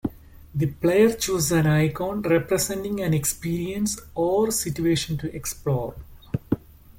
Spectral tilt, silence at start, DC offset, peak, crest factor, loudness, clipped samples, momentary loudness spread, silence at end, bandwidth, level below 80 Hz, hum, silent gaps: -5 dB/octave; 0.05 s; under 0.1%; -6 dBFS; 18 dB; -24 LUFS; under 0.1%; 10 LU; 0.4 s; 17 kHz; -46 dBFS; none; none